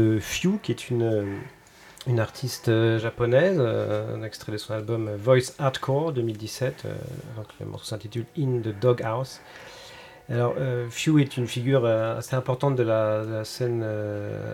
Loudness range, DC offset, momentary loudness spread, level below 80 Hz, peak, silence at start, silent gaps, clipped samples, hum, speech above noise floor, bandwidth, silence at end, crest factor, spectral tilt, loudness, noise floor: 5 LU; under 0.1%; 15 LU; -58 dBFS; -6 dBFS; 0 s; none; under 0.1%; none; 20 dB; 15.5 kHz; 0 s; 18 dB; -6.5 dB/octave; -26 LUFS; -46 dBFS